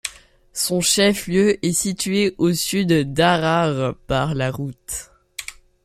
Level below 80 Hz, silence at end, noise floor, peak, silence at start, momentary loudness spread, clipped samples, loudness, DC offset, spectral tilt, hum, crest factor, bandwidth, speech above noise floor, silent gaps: -46 dBFS; 0.35 s; -45 dBFS; -2 dBFS; 0.05 s; 16 LU; under 0.1%; -19 LUFS; under 0.1%; -4 dB/octave; none; 18 dB; 16 kHz; 26 dB; none